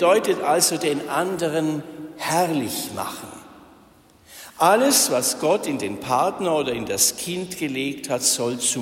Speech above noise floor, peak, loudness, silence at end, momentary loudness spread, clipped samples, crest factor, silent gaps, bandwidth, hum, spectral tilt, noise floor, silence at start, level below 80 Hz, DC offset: 31 dB; -4 dBFS; -21 LUFS; 0 s; 13 LU; under 0.1%; 18 dB; none; 16.5 kHz; none; -2.5 dB/octave; -52 dBFS; 0 s; -62 dBFS; under 0.1%